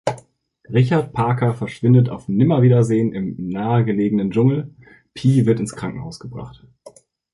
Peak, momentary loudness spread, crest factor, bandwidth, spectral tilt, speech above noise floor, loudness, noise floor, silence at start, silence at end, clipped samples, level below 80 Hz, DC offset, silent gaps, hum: -4 dBFS; 18 LU; 16 dB; 11 kHz; -8.5 dB/octave; 32 dB; -18 LUFS; -50 dBFS; 0.05 s; 0.45 s; under 0.1%; -52 dBFS; under 0.1%; none; none